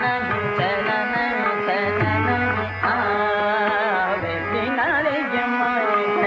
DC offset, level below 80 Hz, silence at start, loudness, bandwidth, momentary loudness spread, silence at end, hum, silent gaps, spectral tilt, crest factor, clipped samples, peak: under 0.1%; -54 dBFS; 0 s; -21 LUFS; 7.6 kHz; 3 LU; 0 s; none; none; -3.5 dB/octave; 14 dB; under 0.1%; -8 dBFS